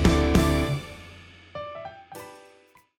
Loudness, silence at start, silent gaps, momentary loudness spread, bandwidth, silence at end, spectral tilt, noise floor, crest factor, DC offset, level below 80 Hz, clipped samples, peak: -25 LUFS; 0 s; none; 24 LU; 16.5 kHz; 0.6 s; -6 dB/octave; -57 dBFS; 18 dB; under 0.1%; -32 dBFS; under 0.1%; -8 dBFS